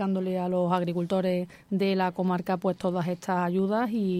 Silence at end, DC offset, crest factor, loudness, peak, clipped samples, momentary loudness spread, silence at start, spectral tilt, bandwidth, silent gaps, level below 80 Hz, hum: 0 s; under 0.1%; 14 dB; -28 LUFS; -12 dBFS; under 0.1%; 3 LU; 0 s; -7.5 dB/octave; 14 kHz; none; -66 dBFS; none